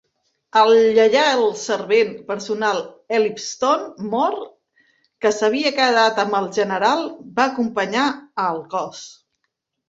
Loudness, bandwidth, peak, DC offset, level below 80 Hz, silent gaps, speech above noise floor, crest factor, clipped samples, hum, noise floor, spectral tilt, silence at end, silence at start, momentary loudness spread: -19 LUFS; 7.8 kHz; -2 dBFS; under 0.1%; -66 dBFS; none; 57 dB; 18 dB; under 0.1%; none; -76 dBFS; -3.5 dB/octave; 0.75 s; 0.55 s; 12 LU